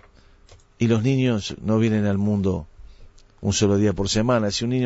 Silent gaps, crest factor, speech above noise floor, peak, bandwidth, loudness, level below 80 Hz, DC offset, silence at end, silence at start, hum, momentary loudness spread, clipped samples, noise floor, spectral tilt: none; 16 dB; 31 dB; -8 dBFS; 8 kHz; -22 LUFS; -44 dBFS; under 0.1%; 0 s; 0.5 s; none; 6 LU; under 0.1%; -51 dBFS; -5.5 dB/octave